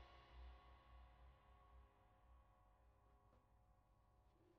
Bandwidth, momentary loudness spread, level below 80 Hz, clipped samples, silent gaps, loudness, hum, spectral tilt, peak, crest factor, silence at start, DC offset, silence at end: 5.8 kHz; 4 LU; -70 dBFS; under 0.1%; none; -67 LUFS; none; -4.5 dB/octave; -52 dBFS; 16 dB; 0 s; under 0.1%; 0 s